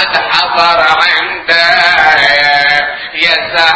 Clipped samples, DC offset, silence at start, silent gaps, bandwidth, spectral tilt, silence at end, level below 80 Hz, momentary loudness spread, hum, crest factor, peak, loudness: 1%; under 0.1%; 0 s; none; 8 kHz; -2 dB/octave; 0 s; -44 dBFS; 5 LU; none; 10 dB; 0 dBFS; -8 LUFS